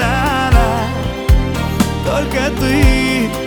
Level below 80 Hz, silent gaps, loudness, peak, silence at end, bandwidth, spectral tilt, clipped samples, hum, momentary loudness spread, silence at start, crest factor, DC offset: -18 dBFS; none; -15 LUFS; 0 dBFS; 0 s; over 20 kHz; -5.5 dB/octave; under 0.1%; none; 6 LU; 0 s; 14 dB; under 0.1%